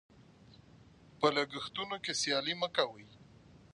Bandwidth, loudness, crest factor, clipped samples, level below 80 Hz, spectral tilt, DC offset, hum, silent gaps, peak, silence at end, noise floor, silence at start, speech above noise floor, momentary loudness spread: 11 kHz; -34 LUFS; 24 dB; under 0.1%; -70 dBFS; -2.5 dB/octave; under 0.1%; none; none; -14 dBFS; 0.5 s; -60 dBFS; 0.2 s; 25 dB; 8 LU